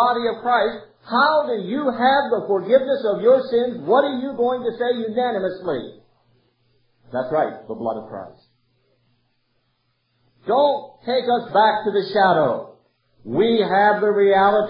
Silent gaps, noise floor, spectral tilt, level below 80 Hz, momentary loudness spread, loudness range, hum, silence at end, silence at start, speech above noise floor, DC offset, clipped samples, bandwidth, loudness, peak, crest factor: none; -68 dBFS; -10 dB/octave; -66 dBFS; 11 LU; 11 LU; none; 0 s; 0 s; 49 dB; under 0.1%; under 0.1%; 5.4 kHz; -20 LUFS; -4 dBFS; 16 dB